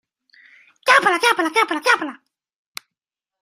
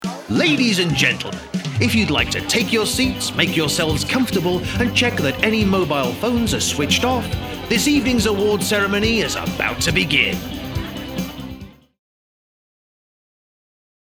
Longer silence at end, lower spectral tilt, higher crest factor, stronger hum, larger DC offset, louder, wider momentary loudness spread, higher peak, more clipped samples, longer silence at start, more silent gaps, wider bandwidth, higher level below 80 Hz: second, 1.25 s vs 2.35 s; second, -1 dB/octave vs -4 dB/octave; about the same, 22 dB vs 20 dB; neither; neither; about the same, -17 LUFS vs -18 LUFS; first, 23 LU vs 11 LU; about the same, 0 dBFS vs 0 dBFS; neither; first, 0.85 s vs 0 s; neither; second, 16 kHz vs over 20 kHz; second, -76 dBFS vs -38 dBFS